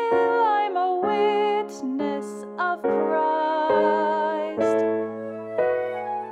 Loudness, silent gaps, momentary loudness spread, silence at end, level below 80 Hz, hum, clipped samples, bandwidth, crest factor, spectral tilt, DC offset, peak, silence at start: -23 LUFS; none; 9 LU; 0 s; -70 dBFS; none; under 0.1%; 10.5 kHz; 14 dB; -5.5 dB/octave; under 0.1%; -8 dBFS; 0 s